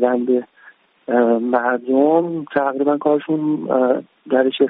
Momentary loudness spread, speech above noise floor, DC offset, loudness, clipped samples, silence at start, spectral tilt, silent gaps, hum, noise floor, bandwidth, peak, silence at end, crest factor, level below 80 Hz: 5 LU; 32 dB; under 0.1%; -18 LUFS; under 0.1%; 0 s; -4.5 dB/octave; none; none; -49 dBFS; 4 kHz; -2 dBFS; 0 s; 16 dB; -68 dBFS